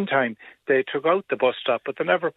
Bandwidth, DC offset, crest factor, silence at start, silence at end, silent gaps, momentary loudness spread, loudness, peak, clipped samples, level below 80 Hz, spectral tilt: 4.1 kHz; under 0.1%; 18 dB; 0 s; 0.05 s; none; 4 LU; -23 LUFS; -6 dBFS; under 0.1%; -76 dBFS; -8 dB/octave